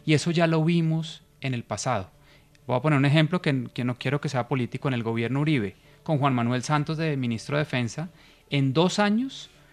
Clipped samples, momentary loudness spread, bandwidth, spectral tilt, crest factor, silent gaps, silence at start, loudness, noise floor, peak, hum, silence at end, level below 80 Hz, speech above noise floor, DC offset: under 0.1%; 12 LU; 10.5 kHz; -6 dB/octave; 16 dB; none; 0.05 s; -25 LUFS; -55 dBFS; -8 dBFS; none; 0.25 s; -62 dBFS; 31 dB; under 0.1%